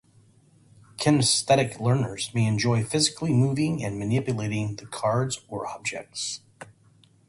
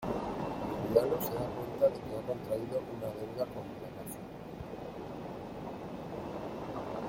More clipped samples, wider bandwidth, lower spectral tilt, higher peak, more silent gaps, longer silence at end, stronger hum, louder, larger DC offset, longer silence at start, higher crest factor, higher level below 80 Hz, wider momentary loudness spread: neither; second, 11.5 kHz vs 16.5 kHz; second, -4.5 dB/octave vs -6.5 dB/octave; first, -6 dBFS vs -12 dBFS; neither; first, 0.65 s vs 0 s; neither; first, -25 LUFS vs -37 LUFS; neither; first, 1 s vs 0 s; about the same, 20 dB vs 24 dB; about the same, -56 dBFS vs -58 dBFS; about the same, 11 LU vs 13 LU